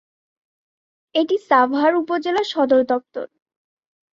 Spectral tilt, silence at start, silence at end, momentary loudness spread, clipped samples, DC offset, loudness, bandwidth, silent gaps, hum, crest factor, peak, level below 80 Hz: -4 dB/octave; 1.15 s; 0.85 s; 13 LU; under 0.1%; under 0.1%; -19 LUFS; 7.6 kHz; none; none; 18 dB; -4 dBFS; -68 dBFS